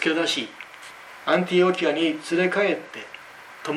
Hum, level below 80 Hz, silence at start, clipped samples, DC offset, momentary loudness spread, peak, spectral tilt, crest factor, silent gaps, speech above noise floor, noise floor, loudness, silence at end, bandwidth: none; -74 dBFS; 0 s; under 0.1%; under 0.1%; 20 LU; -8 dBFS; -4.5 dB/octave; 16 dB; none; 21 dB; -43 dBFS; -23 LUFS; 0 s; 13.5 kHz